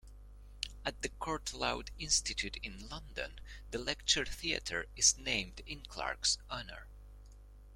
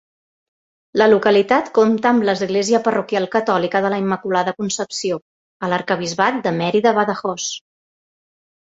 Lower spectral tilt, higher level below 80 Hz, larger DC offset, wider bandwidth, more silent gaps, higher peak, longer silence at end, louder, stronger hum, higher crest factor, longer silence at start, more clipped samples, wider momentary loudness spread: second, -1 dB/octave vs -4.5 dB/octave; first, -50 dBFS vs -62 dBFS; neither; first, 16.5 kHz vs 8 kHz; second, none vs 5.22-5.60 s; second, -14 dBFS vs -2 dBFS; second, 0 s vs 1.15 s; second, -35 LUFS vs -18 LUFS; first, 50 Hz at -50 dBFS vs none; first, 24 dB vs 18 dB; second, 0.05 s vs 0.95 s; neither; first, 16 LU vs 9 LU